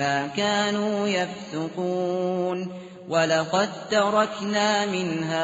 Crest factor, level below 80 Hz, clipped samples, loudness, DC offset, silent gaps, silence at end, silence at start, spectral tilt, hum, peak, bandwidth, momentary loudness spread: 16 dB; -68 dBFS; under 0.1%; -24 LUFS; under 0.1%; none; 0 s; 0 s; -3 dB/octave; none; -8 dBFS; 8 kHz; 8 LU